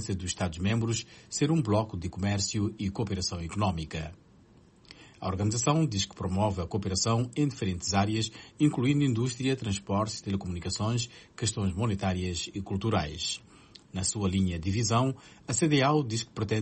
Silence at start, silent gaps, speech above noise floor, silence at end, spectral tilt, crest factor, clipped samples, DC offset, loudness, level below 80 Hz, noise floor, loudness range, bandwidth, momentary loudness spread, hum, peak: 0 s; none; 29 dB; 0 s; -5 dB/octave; 18 dB; under 0.1%; under 0.1%; -30 LUFS; -52 dBFS; -58 dBFS; 3 LU; 8.8 kHz; 8 LU; none; -12 dBFS